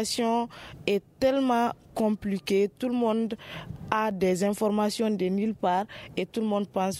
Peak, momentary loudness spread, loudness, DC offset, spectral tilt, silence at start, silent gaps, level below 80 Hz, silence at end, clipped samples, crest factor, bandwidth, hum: -8 dBFS; 8 LU; -27 LUFS; under 0.1%; -5.5 dB/octave; 0 s; none; -60 dBFS; 0 s; under 0.1%; 18 dB; 15.5 kHz; none